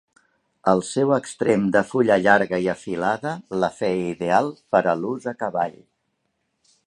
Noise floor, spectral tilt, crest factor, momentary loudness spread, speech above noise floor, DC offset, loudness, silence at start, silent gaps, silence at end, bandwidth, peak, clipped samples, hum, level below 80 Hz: -73 dBFS; -6 dB/octave; 22 dB; 9 LU; 52 dB; under 0.1%; -22 LUFS; 0.65 s; none; 1.15 s; 11.5 kHz; -2 dBFS; under 0.1%; none; -60 dBFS